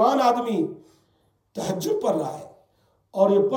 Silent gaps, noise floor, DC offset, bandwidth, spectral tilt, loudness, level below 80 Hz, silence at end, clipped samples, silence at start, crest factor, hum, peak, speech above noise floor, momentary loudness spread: none; -66 dBFS; under 0.1%; 18 kHz; -6 dB/octave; -24 LUFS; -70 dBFS; 0 s; under 0.1%; 0 s; 18 dB; none; -6 dBFS; 44 dB; 18 LU